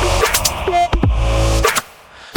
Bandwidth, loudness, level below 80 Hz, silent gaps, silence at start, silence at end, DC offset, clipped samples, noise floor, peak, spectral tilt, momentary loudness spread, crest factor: over 20 kHz; -16 LUFS; -20 dBFS; none; 0 s; 0 s; under 0.1%; under 0.1%; -39 dBFS; 0 dBFS; -3.5 dB/octave; 3 LU; 16 dB